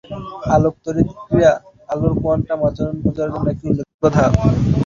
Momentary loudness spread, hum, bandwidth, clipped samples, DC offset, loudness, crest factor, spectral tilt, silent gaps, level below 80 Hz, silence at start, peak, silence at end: 8 LU; none; 7.4 kHz; under 0.1%; under 0.1%; -18 LUFS; 16 dB; -8.5 dB/octave; 3.94-3.99 s; -32 dBFS; 0.1 s; -2 dBFS; 0 s